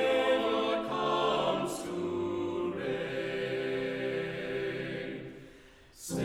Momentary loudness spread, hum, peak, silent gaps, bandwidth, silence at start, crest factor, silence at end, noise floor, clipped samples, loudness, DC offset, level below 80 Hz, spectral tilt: 10 LU; none; -18 dBFS; none; 16.5 kHz; 0 s; 16 dB; 0 s; -55 dBFS; under 0.1%; -32 LUFS; under 0.1%; -64 dBFS; -5 dB/octave